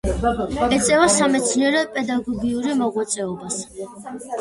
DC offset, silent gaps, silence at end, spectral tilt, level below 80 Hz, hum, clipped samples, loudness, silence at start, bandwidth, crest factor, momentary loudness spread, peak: under 0.1%; none; 0 s; -3.5 dB/octave; -38 dBFS; none; under 0.1%; -20 LUFS; 0.05 s; 11.5 kHz; 16 dB; 15 LU; -4 dBFS